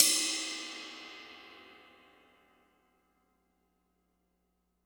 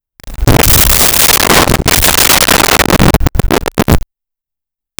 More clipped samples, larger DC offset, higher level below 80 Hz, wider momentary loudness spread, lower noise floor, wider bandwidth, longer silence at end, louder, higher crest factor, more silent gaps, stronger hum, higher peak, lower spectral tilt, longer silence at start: neither; neither; second, -84 dBFS vs -18 dBFS; first, 25 LU vs 8 LU; second, -78 dBFS vs -83 dBFS; about the same, over 20 kHz vs over 20 kHz; first, 3.1 s vs 1 s; second, -32 LUFS vs -7 LUFS; first, 36 dB vs 10 dB; neither; first, 60 Hz at -80 dBFS vs none; about the same, -2 dBFS vs 0 dBFS; second, 2 dB/octave vs -3 dB/octave; second, 0 s vs 0.25 s